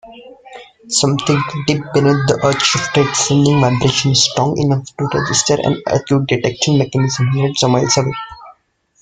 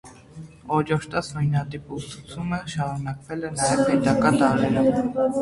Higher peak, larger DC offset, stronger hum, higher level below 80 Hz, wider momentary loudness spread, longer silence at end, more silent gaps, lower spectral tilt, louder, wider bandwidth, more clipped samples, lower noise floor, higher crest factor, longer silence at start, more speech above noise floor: first, 0 dBFS vs -4 dBFS; neither; neither; about the same, -46 dBFS vs -50 dBFS; second, 6 LU vs 15 LU; first, 0.5 s vs 0 s; neither; second, -4.5 dB/octave vs -6 dB/octave; first, -14 LUFS vs -23 LUFS; second, 9.6 kHz vs 11.5 kHz; neither; first, -55 dBFS vs -43 dBFS; about the same, 16 dB vs 20 dB; about the same, 0.05 s vs 0.05 s; first, 41 dB vs 20 dB